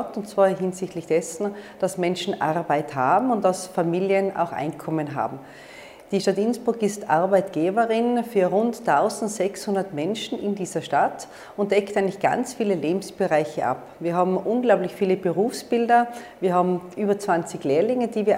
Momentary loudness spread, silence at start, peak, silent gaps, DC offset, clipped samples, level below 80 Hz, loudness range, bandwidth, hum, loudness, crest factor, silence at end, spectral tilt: 8 LU; 0 s; -6 dBFS; none; under 0.1%; under 0.1%; -66 dBFS; 3 LU; 16 kHz; none; -23 LUFS; 18 dB; 0 s; -5.5 dB/octave